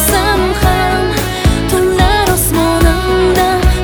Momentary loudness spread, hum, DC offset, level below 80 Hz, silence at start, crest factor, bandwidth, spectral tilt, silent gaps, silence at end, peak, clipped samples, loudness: 3 LU; none; under 0.1%; -18 dBFS; 0 s; 10 dB; over 20 kHz; -4.5 dB/octave; none; 0 s; 0 dBFS; under 0.1%; -12 LUFS